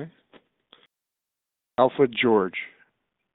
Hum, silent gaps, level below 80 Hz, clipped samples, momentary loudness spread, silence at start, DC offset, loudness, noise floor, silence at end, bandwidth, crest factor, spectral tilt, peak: none; none; -70 dBFS; under 0.1%; 19 LU; 0 s; under 0.1%; -23 LUFS; -86 dBFS; 0.65 s; 4.1 kHz; 22 dB; -9.5 dB/octave; -6 dBFS